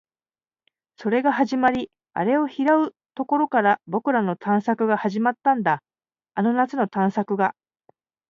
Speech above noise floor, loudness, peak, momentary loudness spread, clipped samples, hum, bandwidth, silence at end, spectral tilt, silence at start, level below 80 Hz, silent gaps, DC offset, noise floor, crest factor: over 69 dB; -22 LUFS; -6 dBFS; 7 LU; under 0.1%; none; 7.2 kHz; 0.8 s; -7.5 dB/octave; 1 s; -68 dBFS; none; under 0.1%; under -90 dBFS; 18 dB